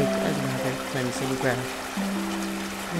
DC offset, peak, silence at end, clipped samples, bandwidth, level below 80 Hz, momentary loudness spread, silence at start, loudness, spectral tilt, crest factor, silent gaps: under 0.1%; -10 dBFS; 0 s; under 0.1%; 16 kHz; -52 dBFS; 4 LU; 0 s; -28 LUFS; -4.5 dB/octave; 16 dB; none